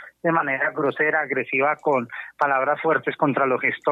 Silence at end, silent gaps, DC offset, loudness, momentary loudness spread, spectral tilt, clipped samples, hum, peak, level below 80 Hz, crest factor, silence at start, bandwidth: 0 s; none; under 0.1%; -22 LUFS; 3 LU; -8 dB/octave; under 0.1%; none; -4 dBFS; -74 dBFS; 18 dB; 0 s; 7.6 kHz